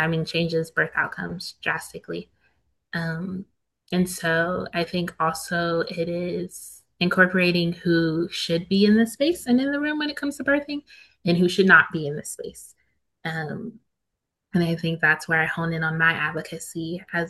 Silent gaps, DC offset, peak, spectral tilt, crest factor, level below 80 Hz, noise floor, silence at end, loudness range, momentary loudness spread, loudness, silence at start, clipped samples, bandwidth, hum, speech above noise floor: none; under 0.1%; -2 dBFS; -5 dB/octave; 22 dB; -58 dBFS; -81 dBFS; 0 s; 7 LU; 15 LU; -23 LUFS; 0 s; under 0.1%; 12.5 kHz; none; 58 dB